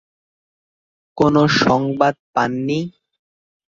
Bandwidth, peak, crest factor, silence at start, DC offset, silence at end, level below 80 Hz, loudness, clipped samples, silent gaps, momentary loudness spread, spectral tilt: 7.6 kHz; -2 dBFS; 18 dB; 1.15 s; under 0.1%; 0.8 s; -52 dBFS; -17 LUFS; under 0.1%; 2.19-2.34 s; 9 LU; -6 dB/octave